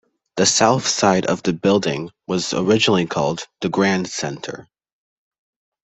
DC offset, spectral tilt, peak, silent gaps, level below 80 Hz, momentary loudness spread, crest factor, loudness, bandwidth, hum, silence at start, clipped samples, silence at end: under 0.1%; -4 dB/octave; -2 dBFS; none; -56 dBFS; 12 LU; 18 dB; -19 LUFS; 8.4 kHz; none; 0.35 s; under 0.1%; 1.2 s